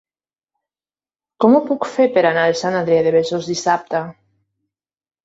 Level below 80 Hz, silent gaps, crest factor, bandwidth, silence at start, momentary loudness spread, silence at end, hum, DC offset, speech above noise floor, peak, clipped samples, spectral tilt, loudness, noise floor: -64 dBFS; none; 18 dB; 8 kHz; 1.4 s; 8 LU; 1.15 s; none; under 0.1%; over 74 dB; 0 dBFS; under 0.1%; -5 dB/octave; -17 LUFS; under -90 dBFS